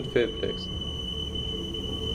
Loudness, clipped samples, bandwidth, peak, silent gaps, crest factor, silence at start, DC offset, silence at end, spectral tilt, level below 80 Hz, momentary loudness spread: -30 LUFS; under 0.1%; 16 kHz; -10 dBFS; none; 20 dB; 0 s; under 0.1%; 0 s; -5 dB/octave; -40 dBFS; 5 LU